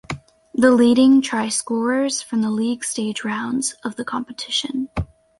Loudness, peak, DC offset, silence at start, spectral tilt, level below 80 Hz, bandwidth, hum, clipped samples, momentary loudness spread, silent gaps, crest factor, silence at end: -20 LUFS; -2 dBFS; under 0.1%; 0.1 s; -4 dB/octave; -44 dBFS; 11.5 kHz; none; under 0.1%; 15 LU; none; 18 dB; 0.35 s